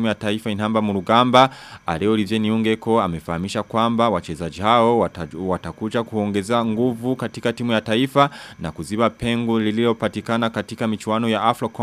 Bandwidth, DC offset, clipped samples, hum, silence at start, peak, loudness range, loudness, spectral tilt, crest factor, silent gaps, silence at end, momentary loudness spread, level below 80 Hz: 14 kHz; under 0.1%; under 0.1%; none; 0 s; 0 dBFS; 2 LU; -20 LUFS; -6 dB/octave; 20 dB; none; 0 s; 9 LU; -50 dBFS